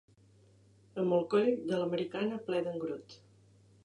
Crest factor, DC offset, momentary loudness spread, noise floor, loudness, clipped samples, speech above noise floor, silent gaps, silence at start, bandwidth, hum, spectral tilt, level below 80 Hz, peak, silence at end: 18 dB; under 0.1%; 11 LU; -63 dBFS; -33 LUFS; under 0.1%; 31 dB; none; 0.95 s; 10.5 kHz; none; -7 dB/octave; -78 dBFS; -16 dBFS; 0.7 s